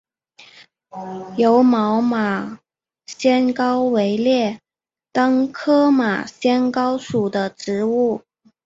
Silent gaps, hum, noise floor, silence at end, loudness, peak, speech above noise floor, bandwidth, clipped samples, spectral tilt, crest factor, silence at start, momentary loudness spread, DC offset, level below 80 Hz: none; none; under -90 dBFS; 0.5 s; -18 LUFS; -4 dBFS; over 72 dB; 7.8 kHz; under 0.1%; -6 dB/octave; 16 dB; 0.95 s; 15 LU; under 0.1%; -64 dBFS